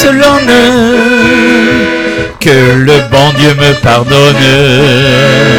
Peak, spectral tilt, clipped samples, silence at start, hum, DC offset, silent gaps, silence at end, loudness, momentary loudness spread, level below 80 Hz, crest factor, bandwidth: 0 dBFS; -5 dB/octave; 6%; 0 s; none; 1%; none; 0 s; -5 LUFS; 3 LU; -30 dBFS; 6 dB; 19 kHz